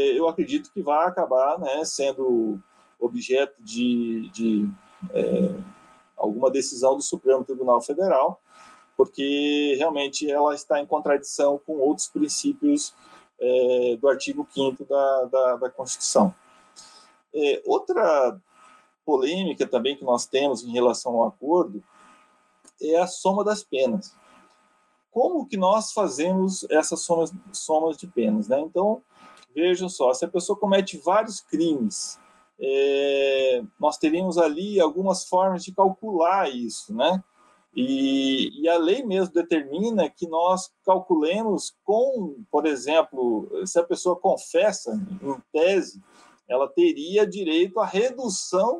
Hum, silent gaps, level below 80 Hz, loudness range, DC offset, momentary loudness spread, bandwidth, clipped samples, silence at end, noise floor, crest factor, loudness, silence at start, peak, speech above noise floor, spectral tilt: none; none; -72 dBFS; 2 LU; under 0.1%; 7 LU; 12 kHz; under 0.1%; 0 s; -65 dBFS; 18 dB; -24 LUFS; 0 s; -6 dBFS; 42 dB; -4.5 dB/octave